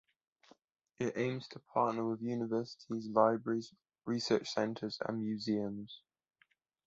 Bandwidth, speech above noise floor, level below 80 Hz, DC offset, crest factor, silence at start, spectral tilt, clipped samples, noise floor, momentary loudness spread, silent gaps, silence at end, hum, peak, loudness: 8 kHz; 39 dB; -76 dBFS; under 0.1%; 24 dB; 1 s; -5 dB/octave; under 0.1%; -75 dBFS; 13 LU; none; 0.9 s; none; -14 dBFS; -36 LUFS